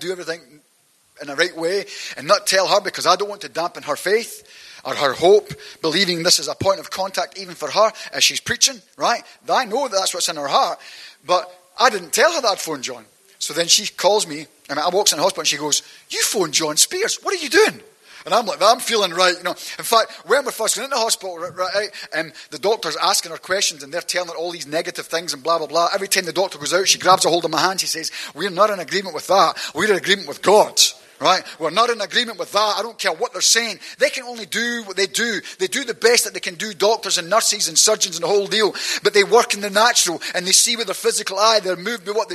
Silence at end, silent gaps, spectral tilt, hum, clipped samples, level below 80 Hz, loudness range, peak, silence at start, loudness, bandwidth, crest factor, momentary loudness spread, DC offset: 0 s; none; -1 dB/octave; none; under 0.1%; -66 dBFS; 5 LU; 0 dBFS; 0 s; -18 LUFS; 13 kHz; 20 dB; 11 LU; under 0.1%